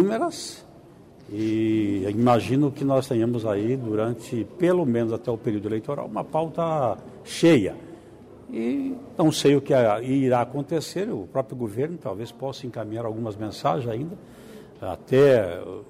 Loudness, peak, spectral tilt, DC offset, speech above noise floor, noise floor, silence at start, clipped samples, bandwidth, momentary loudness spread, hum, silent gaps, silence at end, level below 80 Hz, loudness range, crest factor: -24 LUFS; -8 dBFS; -6.5 dB/octave; under 0.1%; 25 dB; -48 dBFS; 0 s; under 0.1%; 15.5 kHz; 16 LU; none; none; 0.05 s; -60 dBFS; 6 LU; 16 dB